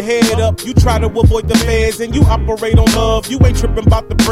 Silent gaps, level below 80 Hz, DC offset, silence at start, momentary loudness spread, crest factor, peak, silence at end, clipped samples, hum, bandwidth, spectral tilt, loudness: none; -18 dBFS; under 0.1%; 0 s; 4 LU; 10 dB; 0 dBFS; 0 s; under 0.1%; none; 15.5 kHz; -5.5 dB/octave; -13 LUFS